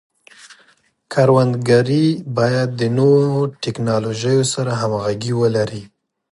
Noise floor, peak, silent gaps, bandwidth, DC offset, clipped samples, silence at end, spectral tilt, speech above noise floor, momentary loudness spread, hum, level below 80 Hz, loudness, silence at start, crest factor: -56 dBFS; -2 dBFS; none; 11.5 kHz; under 0.1%; under 0.1%; 0.45 s; -6 dB/octave; 40 dB; 8 LU; none; -56 dBFS; -17 LUFS; 0.5 s; 16 dB